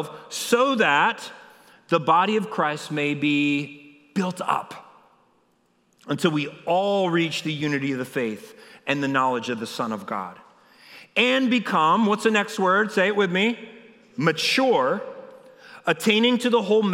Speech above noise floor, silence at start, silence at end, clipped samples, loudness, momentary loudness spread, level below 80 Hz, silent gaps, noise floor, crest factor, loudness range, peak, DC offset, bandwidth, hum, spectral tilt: 43 dB; 0 s; 0 s; under 0.1%; -22 LUFS; 12 LU; -80 dBFS; none; -65 dBFS; 20 dB; 6 LU; -4 dBFS; under 0.1%; 16.5 kHz; none; -4.5 dB/octave